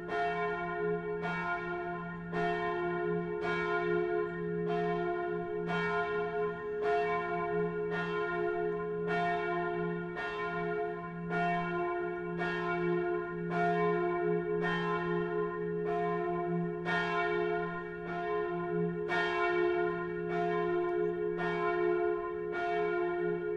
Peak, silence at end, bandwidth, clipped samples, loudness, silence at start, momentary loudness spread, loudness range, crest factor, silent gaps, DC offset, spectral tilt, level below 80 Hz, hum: -18 dBFS; 0 s; 7.6 kHz; under 0.1%; -33 LUFS; 0 s; 5 LU; 2 LU; 14 dB; none; under 0.1%; -7.5 dB/octave; -60 dBFS; none